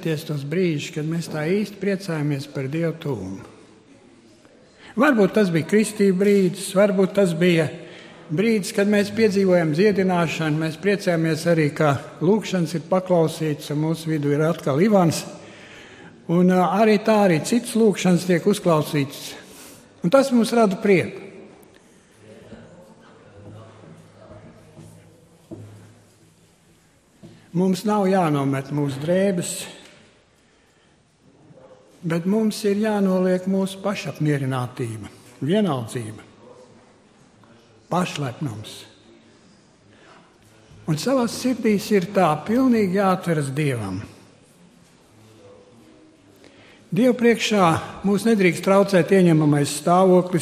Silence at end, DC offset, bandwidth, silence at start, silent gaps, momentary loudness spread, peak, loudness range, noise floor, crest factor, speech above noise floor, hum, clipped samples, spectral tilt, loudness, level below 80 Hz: 0 s; under 0.1%; 15 kHz; 0 s; none; 14 LU; -2 dBFS; 10 LU; -58 dBFS; 20 dB; 38 dB; none; under 0.1%; -6 dB/octave; -20 LUFS; -60 dBFS